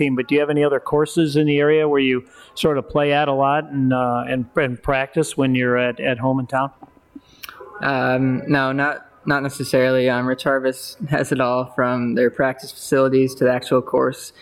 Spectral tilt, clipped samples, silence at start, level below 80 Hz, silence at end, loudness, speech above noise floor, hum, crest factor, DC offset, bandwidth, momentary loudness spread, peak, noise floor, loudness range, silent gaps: -6 dB/octave; under 0.1%; 0 s; -50 dBFS; 0.1 s; -19 LUFS; 26 dB; none; 14 dB; under 0.1%; 16 kHz; 6 LU; -6 dBFS; -45 dBFS; 3 LU; none